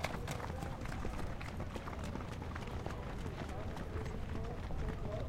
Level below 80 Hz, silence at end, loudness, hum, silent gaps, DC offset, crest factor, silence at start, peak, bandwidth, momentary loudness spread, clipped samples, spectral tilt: -46 dBFS; 0 s; -44 LUFS; none; none; under 0.1%; 20 dB; 0 s; -20 dBFS; 16.5 kHz; 2 LU; under 0.1%; -6 dB/octave